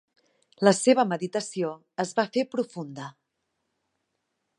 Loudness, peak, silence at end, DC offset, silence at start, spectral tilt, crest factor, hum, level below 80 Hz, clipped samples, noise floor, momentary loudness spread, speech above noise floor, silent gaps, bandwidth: -26 LUFS; -4 dBFS; 1.5 s; under 0.1%; 0.6 s; -4.5 dB/octave; 24 dB; none; -80 dBFS; under 0.1%; -79 dBFS; 16 LU; 54 dB; none; 11.5 kHz